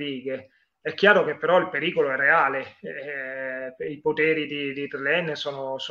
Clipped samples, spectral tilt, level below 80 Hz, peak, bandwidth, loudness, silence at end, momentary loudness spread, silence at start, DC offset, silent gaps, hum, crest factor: under 0.1%; -5.5 dB/octave; -74 dBFS; -2 dBFS; 7.4 kHz; -24 LUFS; 0 s; 15 LU; 0 s; under 0.1%; none; none; 22 dB